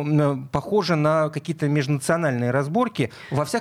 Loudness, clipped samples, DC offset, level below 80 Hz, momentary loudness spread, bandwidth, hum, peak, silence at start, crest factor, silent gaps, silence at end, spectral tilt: -23 LUFS; under 0.1%; under 0.1%; -56 dBFS; 6 LU; 14.5 kHz; none; -6 dBFS; 0 s; 16 dB; none; 0 s; -6.5 dB/octave